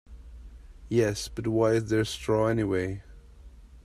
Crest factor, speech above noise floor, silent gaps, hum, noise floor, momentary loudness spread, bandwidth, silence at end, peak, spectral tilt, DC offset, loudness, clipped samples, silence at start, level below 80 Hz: 18 dB; 23 dB; none; none; -49 dBFS; 9 LU; 15 kHz; 0.05 s; -12 dBFS; -6 dB/octave; under 0.1%; -27 LUFS; under 0.1%; 0.1 s; -48 dBFS